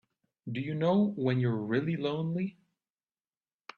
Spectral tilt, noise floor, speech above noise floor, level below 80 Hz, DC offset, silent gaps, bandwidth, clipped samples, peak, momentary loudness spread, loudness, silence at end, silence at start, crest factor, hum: -9 dB/octave; under -90 dBFS; over 60 dB; -72 dBFS; under 0.1%; none; 6.8 kHz; under 0.1%; -16 dBFS; 11 LU; -31 LUFS; 1.25 s; 0.45 s; 16 dB; none